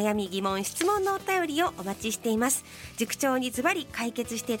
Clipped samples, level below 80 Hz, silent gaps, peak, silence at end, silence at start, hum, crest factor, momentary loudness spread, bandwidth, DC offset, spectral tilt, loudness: under 0.1%; -58 dBFS; none; -10 dBFS; 0 s; 0 s; none; 18 dB; 6 LU; 17 kHz; under 0.1%; -3 dB/octave; -28 LUFS